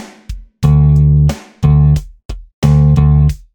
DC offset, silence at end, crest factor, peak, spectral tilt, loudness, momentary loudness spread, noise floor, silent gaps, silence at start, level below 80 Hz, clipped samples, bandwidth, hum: under 0.1%; 0.2 s; 10 dB; 0 dBFS; -8.5 dB/octave; -11 LUFS; 22 LU; -29 dBFS; 2.25-2.29 s, 2.54-2.62 s; 0 s; -18 dBFS; under 0.1%; 8 kHz; none